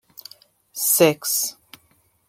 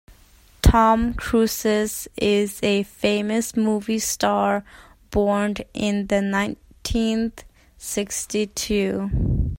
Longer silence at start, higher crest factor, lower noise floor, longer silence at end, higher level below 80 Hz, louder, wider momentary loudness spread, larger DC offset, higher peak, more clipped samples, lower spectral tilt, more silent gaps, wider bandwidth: first, 0.75 s vs 0.1 s; about the same, 22 dB vs 20 dB; first, -62 dBFS vs -52 dBFS; first, 0.75 s vs 0.05 s; second, -72 dBFS vs -32 dBFS; first, -19 LUFS vs -22 LUFS; first, 24 LU vs 8 LU; neither; about the same, -2 dBFS vs -2 dBFS; neither; second, -2.5 dB/octave vs -5 dB/octave; neither; about the same, 16.5 kHz vs 16.5 kHz